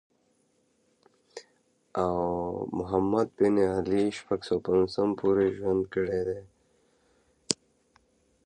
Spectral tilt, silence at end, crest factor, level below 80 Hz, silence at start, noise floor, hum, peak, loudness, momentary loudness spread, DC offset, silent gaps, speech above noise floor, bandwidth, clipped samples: -5.5 dB/octave; 0.9 s; 28 dB; -56 dBFS; 1.35 s; -70 dBFS; none; -2 dBFS; -28 LUFS; 11 LU; under 0.1%; none; 43 dB; 11 kHz; under 0.1%